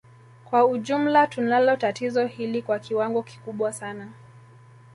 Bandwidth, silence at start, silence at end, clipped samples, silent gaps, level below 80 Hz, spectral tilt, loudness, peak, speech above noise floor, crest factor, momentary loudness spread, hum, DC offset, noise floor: 11.5 kHz; 0.5 s; 0.55 s; under 0.1%; none; -70 dBFS; -5.5 dB/octave; -23 LUFS; -6 dBFS; 26 dB; 18 dB; 15 LU; none; under 0.1%; -50 dBFS